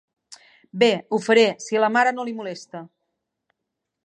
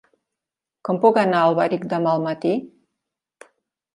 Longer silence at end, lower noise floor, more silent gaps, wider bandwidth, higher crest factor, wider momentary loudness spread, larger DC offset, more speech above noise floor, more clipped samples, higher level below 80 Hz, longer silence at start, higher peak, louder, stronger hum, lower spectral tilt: about the same, 1.2 s vs 1.3 s; second, -82 dBFS vs -87 dBFS; neither; about the same, 10.5 kHz vs 11.5 kHz; about the same, 20 dB vs 20 dB; first, 20 LU vs 10 LU; neither; second, 61 dB vs 68 dB; neither; second, -80 dBFS vs -72 dBFS; second, 0.3 s vs 0.85 s; about the same, -4 dBFS vs -2 dBFS; about the same, -20 LUFS vs -20 LUFS; neither; second, -4 dB/octave vs -7.5 dB/octave